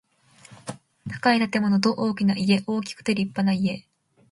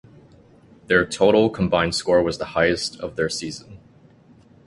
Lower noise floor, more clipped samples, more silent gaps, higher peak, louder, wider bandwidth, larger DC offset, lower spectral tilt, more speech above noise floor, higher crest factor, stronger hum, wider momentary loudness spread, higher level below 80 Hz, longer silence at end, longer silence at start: about the same, -53 dBFS vs -51 dBFS; neither; neither; about the same, -6 dBFS vs -4 dBFS; second, -23 LUFS vs -20 LUFS; about the same, 11.5 kHz vs 11.5 kHz; neither; first, -6 dB/octave vs -4.5 dB/octave; about the same, 31 dB vs 31 dB; about the same, 18 dB vs 20 dB; neither; first, 18 LU vs 11 LU; second, -62 dBFS vs -48 dBFS; second, 0.5 s vs 0.9 s; second, 0.5 s vs 0.9 s